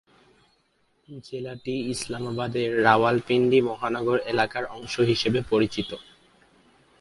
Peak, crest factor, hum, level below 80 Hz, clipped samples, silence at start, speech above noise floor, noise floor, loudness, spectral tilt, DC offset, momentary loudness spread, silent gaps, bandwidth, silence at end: -2 dBFS; 24 dB; none; -56 dBFS; under 0.1%; 1.1 s; 43 dB; -68 dBFS; -24 LUFS; -5.5 dB/octave; under 0.1%; 15 LU; none; 11.5 kHz; 1 s